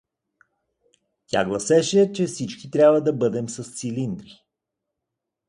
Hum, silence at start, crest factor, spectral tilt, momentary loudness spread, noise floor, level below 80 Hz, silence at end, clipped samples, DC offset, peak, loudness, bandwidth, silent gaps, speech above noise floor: none; 1.35 s; 18 dB; -5 dB/octave; 14 LU; -83 dBFS; -62 dBFS; 1.25 s; under 0.1%; under 0.1%; -4 dBFS; -22 LUFS; 11.5 kHz; none; 62 dB